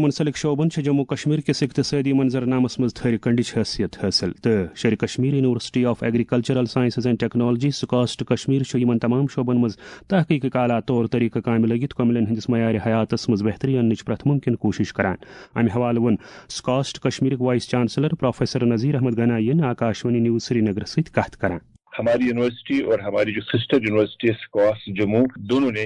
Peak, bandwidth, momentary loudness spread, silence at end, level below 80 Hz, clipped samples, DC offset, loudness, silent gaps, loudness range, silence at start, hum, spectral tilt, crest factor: -4 dBFS; 10.5 kHz; 4 LU; 0 s; -54 dBFS; under 0.1%; under 0.1%; -21 LUFS; none; 1 LU; 0 s; none; -6.5 dB/octave; 16 dB